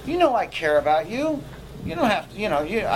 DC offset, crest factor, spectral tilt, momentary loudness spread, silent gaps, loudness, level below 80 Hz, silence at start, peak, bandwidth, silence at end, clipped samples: under 0.1%; 16 dB; -5.5 dB/octave; 12 LU; none; -23 LUFS; -46 dBFS; 0 s; -6 dBFS; 16 kHz; 0 s; under 0.1%